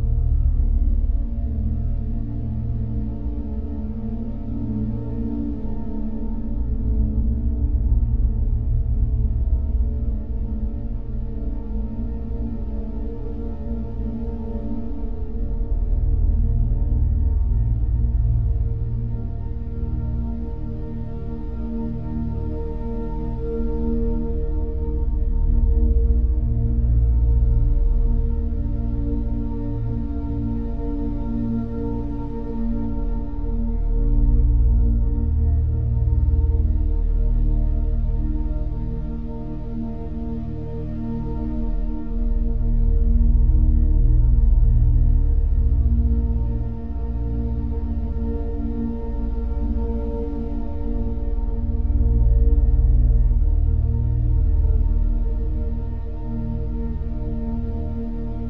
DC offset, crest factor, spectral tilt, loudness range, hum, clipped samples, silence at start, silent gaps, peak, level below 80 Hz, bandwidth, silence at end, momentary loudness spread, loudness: 2%; 14 dB; -12.5 dB/octave; 8 LU; none; under 0.1%; 0 s; none; -6 dBFS; -20 dBFS; 1.9 kHz; 0 s; 10 LU; -24 LUFS